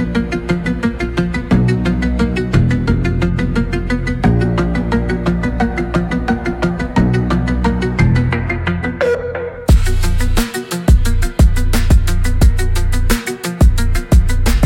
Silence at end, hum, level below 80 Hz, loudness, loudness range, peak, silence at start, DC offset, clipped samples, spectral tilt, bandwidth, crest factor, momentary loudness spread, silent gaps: 0 s; none; -16 dBFS; -16 LUFS; 2 LU; 0 dBFS; 0 s; under 0.1%; under 0.1%; -6.5 dB/octave; 17 kHz; 12 dB; 5 LU; none